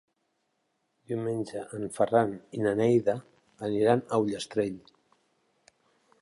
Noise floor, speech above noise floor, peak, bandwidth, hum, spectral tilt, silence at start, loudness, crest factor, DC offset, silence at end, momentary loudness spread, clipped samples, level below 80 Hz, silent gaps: -77 dBFS; 49 dB; -10 dBFS; 11.5 kHz; none; -6.5 dB/octave; 1.1 s; -29 LUFS; 20 dB; under 0.1%; 1.45 s; 12 LU; under 0.1%; -68 dBFS; none